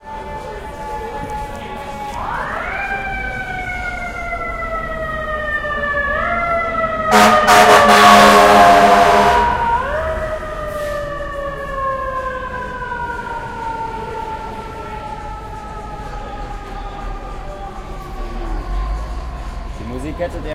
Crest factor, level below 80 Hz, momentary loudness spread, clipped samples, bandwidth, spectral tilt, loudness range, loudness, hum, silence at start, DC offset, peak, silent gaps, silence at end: 16 dB; -30 dBFS; 22 LU; under 0.1%; 16.5 kHz; -3.5 dB/octave; 19 LU; -15 LUFS; none; 0.05 s; under 0.1%; 0 dBFS; none; 0 s